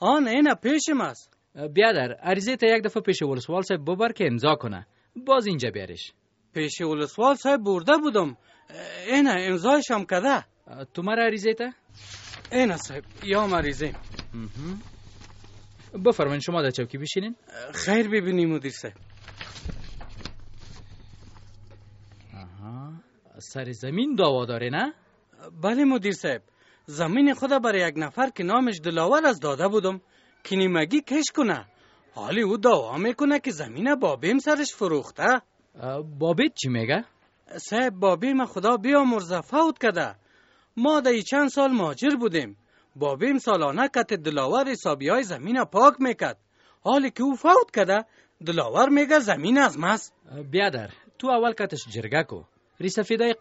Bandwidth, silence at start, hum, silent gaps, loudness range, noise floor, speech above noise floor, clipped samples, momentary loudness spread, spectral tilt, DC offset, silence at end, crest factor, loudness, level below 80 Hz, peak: 8 kHz; 0 s; none; none; 7 LU; -60 dBFS; 37 dB; under 0.1%; 18 LU; -3.5 dB/octave; under 0.1%; 0.05 s; 22 dB; -24 LUFS; -52 dBFS; -2 dBFS